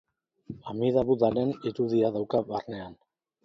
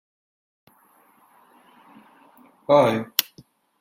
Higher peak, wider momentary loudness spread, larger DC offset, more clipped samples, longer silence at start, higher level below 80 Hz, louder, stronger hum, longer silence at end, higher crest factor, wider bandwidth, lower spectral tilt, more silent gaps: second, -10 dBFS vs 0 dBFS; second, 17 LU vs 23 LU; neither; neither; second, 0.5 s vs 2.7 s; first, -60 dBFS vs -68 dBFS; second, -27 LUFS vs -20 LUFS; neither; about the same, 0.5 s vs 0.6 s; second, 18 dB vs 26 dB; second, 6.4 kHz vs 16.5 kHz; first, -9 dB/octave vs -4 dB/octave; neither